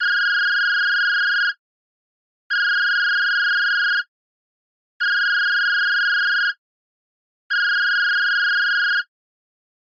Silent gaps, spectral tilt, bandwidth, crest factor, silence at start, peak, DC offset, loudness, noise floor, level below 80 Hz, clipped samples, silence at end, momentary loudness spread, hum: 1.59-2.50 s, 4.08-5.00 s, 6.58-7.50 s; 6.5 dB/octave; 7 kHz; 10 dB; 0 s; -12 dBFS; under 0.1%; -18 LUFS; under -90 dBFS; under -90 dBFS; under 0.1%; 0.95 s; 6 LU; none